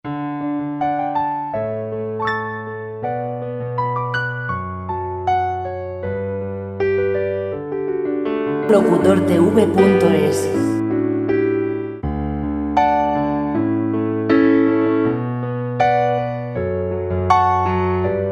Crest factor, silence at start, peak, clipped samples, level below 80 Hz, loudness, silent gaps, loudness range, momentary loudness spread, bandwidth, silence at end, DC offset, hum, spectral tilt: 18 dB; 0.05 s; 0 dBFS; under 0.1%; -42 dBFS; -19 LUFS; none; 7 LU; 11 LU; 14 kHz; 0 s; under 0.1%; none; -7.5 dB/octave